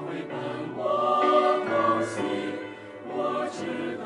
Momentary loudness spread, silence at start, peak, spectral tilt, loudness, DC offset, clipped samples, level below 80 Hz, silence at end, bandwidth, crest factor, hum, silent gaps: 13 LU; 0 s; -10 dBFS; -5.5 dB/octave; -26 LUFS; under 0.1%; under 0.1%; -72 dBFS; 0 s; 11.5 kHz; 18 dB; none; none